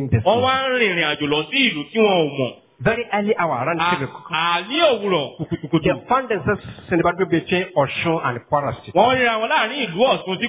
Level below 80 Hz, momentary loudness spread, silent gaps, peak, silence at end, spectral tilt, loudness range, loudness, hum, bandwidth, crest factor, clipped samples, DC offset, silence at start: -48 dBFS; 6 LU; none; -2 dBFS; 0 s; -9.5 dB/octave; 2 LU; -19 LUFS; none; 4 kHz; 16 dB; under 0.1%; under 0.1%; 0 s